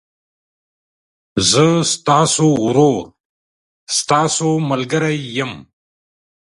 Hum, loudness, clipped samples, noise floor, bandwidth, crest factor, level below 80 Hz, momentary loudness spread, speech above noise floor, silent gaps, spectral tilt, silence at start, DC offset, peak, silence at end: none; -15 LUFS; under 0.1%; under -90 dBFS; 11.5 kHz; 18 dB; -52 dBFS; 10 LU; over 75 dB; 3.20-3.87 s; -4 dB/octave; 1.35 s; under 0.1%; 0 dBFS; 0.85 s